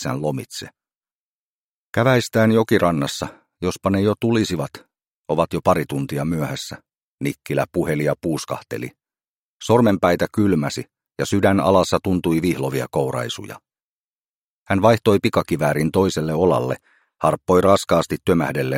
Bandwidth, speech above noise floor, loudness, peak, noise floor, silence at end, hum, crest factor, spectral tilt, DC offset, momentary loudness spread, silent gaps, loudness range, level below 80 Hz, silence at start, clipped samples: 16.5 kHz; over 71 dB; -20 LUFS; 0 dBFS; under -90 dBFS; 0 s; none; 20 dB; -6 dB/octave; under 0.1%; 14 LU; 0.96-1.01 s, 1.11-1.93 s, 5.14-5.24 s, 6.97-7.18 s, 9.28-9.60 s, 13.82-14.66 s; 5 LU; -50 dBFS; 0 s; under 0.1%